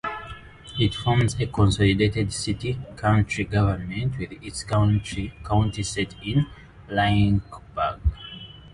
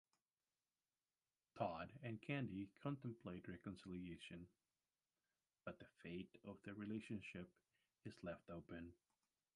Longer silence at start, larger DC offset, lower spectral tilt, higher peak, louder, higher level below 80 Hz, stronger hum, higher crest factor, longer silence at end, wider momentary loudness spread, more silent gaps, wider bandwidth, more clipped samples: second, 0.05 s vs 1.55 s; neither; second, -6 dB/octave vs -7.5 dB/octave; first, -6 dBFS vs -30 dBFS; first, -24 LUFS vs -53 LUFS; first, -36 dBFS vs -76 dBFS; neither; second, 16 dB vs 24 dB; second, 0.05 s vs 0.6 s; about the same, 13 LU vs 12 LU; neither; about the same, 11.5 kHz vs 11 kHz; neither